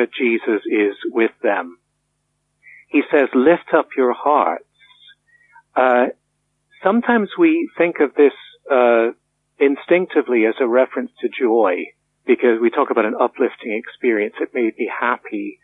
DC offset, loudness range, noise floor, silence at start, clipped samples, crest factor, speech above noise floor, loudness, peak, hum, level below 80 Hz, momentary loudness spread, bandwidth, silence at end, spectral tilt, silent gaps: under 0.1%; 3 LU; -70 dBFS; 0 s; under 0.1%; 16 dB; 53 dB; -18 LUFS; -2 dBFS; none; -74 dBFS; 9 LU; 4 kHz; 0.1 s; -8 dB/octave; none